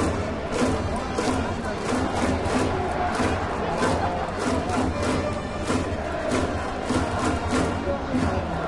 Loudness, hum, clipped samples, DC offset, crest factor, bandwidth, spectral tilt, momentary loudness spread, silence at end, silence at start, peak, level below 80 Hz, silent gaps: -25 LUFS; none; under 0.1%; under 0.1%; 16 dB; 11.5 kHz; -5.5 dB/octave; 4 LU; 0 s; 0 s; -8 dBFS; -38 dBFS; none